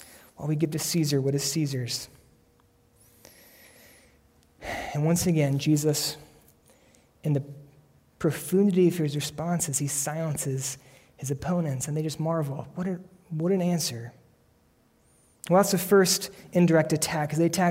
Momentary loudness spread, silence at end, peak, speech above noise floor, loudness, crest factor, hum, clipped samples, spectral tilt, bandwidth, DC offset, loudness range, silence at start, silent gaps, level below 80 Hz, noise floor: 14 LU; 0 s; -10 dBFS; 38 dB; -26 LUFS; 18 dB; none; under 0.1%; -5 dB/octave; 16 kHz; under 0.1%; 7 LU; 0 s; none; -60 dBFS; -64 dBFS